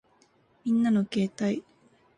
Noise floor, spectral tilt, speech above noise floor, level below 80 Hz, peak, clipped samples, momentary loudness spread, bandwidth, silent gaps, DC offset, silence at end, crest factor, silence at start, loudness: -64 dBFS; -7 dB/octave; 38 dB; -70 dBFS; -16 dBFS; under 0.1%; 10 LU; 10 kHz; none; under 0.1%; 0.55 s; 12 dB; 0.65 s; -28 LUFS